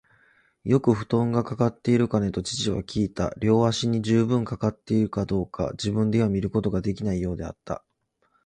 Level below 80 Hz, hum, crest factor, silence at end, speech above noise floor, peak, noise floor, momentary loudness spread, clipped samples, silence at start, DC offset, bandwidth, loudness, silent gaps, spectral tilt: -46 dBFS; none; 18 dB; 0.65 s; 46 dB; -8 dBFS; -69 dBFS; 8 LU; under 0.1%; 0.65 s; under 0.1%; 10 kHz; -25 LUFS; none; -6.5 dB/octave